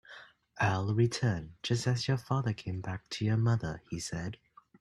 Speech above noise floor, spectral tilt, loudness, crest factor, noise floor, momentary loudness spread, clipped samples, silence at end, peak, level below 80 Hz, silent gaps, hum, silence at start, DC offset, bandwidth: 23 dB; -5.5 dB/octave; -33 LUFS; 16 dB; -54 dBFS; 10 LU; under 0.1%; 0.45 s; -16 dBFS; -60 dBFS; none; none; 0.1 s; under 0.1%; 11.5 kHz